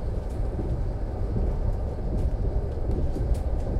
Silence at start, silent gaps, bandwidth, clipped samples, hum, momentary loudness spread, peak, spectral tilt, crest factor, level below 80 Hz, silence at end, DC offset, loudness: 0 s; none; 9.4 kHz; under 0.1%; none; 3 LU; -12 dBFS; -9 dB/octave; 14 dB; -28 dBFS; 0 s; under 0.1%; -30 LUFS